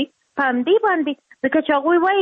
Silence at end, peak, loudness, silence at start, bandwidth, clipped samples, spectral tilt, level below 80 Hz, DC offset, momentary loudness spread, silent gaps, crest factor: 0 s; -6 dBFS; -19 LUFS; 0 s; 4.4 kHz; under 0.1%; -6.5 dB/octave; -64 dBFS; under 0.1%; 9 LU; none; 12 dB